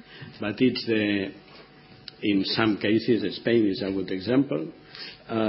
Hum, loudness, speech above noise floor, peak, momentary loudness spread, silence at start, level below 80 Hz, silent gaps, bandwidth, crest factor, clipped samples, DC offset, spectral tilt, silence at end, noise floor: none; -25 LUFS; 25 dB; -6 dBFS; 16 LU; 0.1 s; -58 dBFS; none; 5.8 kHz; 20 dB; under 0.1%; under 0.1%; -10 dB/octave; 0 s; -50 dBFS